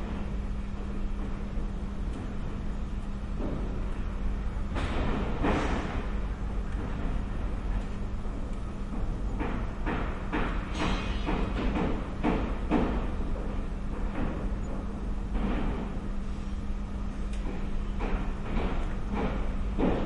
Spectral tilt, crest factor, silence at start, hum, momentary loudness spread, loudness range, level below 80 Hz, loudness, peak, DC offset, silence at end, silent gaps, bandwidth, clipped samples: -7 dB/octave; 16 dB; 0 s; none; 7 LU; 5 LU; -32 dBFS; -34 LUFS; -14 dBFS; under 0.1%; 0 s; none; 10.5 kHz; under 0.1%